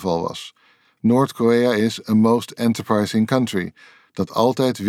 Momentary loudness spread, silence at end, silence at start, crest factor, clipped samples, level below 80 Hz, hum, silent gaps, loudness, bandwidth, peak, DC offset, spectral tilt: 12 LU; 0 s; 0 s; 16 dB; under 0.1%; -60 dBFS; none; none; -19 LUFS; 15 kHz; -4 dBFS; under 0.1%; -6 dB/octave